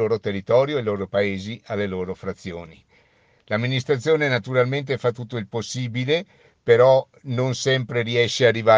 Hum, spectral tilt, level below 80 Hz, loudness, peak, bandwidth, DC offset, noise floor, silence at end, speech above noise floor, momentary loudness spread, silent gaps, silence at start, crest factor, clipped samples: none; -5.5 dB/octave; -62 dBFS; -22 LUFS; -2 dBFS; 9.6 kHz; under 0.1%; -59 dBFS; 0 s; 38 dB; 13 LU; none; 0 s; 20 dB; under 0.1%